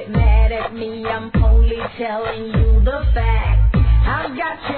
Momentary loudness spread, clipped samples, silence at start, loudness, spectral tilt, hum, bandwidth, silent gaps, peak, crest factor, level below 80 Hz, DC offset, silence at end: 9 LU; under 0.1%; 0 s; -18 LUFS; -11 dB/octave; none; 4.5 kHz; none; -4 dBFS; 12 dB; -16 dBFS; under 0.1%; 0 s